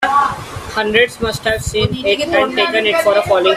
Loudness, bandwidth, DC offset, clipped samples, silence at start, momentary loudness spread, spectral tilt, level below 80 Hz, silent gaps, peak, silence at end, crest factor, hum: -15 LUFS; 15.5 kHz; under 0.1%; under 0.1%; 0 s; 6 LU; -4 dB/octave; -38 dBFS; none; 0 dBFS; 0 s; 14 dB; none